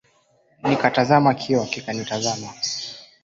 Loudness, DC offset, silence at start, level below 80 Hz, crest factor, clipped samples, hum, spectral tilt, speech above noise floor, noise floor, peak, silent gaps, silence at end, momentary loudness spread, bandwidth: -21 LUFS; under 0.1%; 0.65 s; -60 dBFS; 20 dB; under 0.1%; none; -4.5 dB/octave; 40 dB; -61 dBFS; -2 dBFS; none; 0.2 s; 11 LU; 7.8 kHz